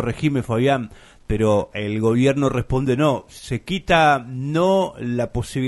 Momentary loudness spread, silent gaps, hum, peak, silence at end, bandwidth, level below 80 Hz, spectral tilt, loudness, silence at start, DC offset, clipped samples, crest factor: 9 LU; none; none; -2 dBFS; 0 s; 11.5 kHz; -40 dBFS; -6.5 dB/octave; -20 LUFS; 0 s; under 0.1%; under 0.1%; 18 dB